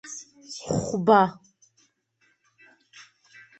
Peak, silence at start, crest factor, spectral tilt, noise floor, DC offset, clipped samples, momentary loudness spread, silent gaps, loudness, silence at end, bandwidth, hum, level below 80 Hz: -4 dBFS; 0.05 s; 24 dB; -5.5 dB/octave; -69 dBFS; under 0.1%; under 0.1%; 21 LU; none; -22 LUFS; 2.25 s; 8.4 kHz; none; -60 dBFS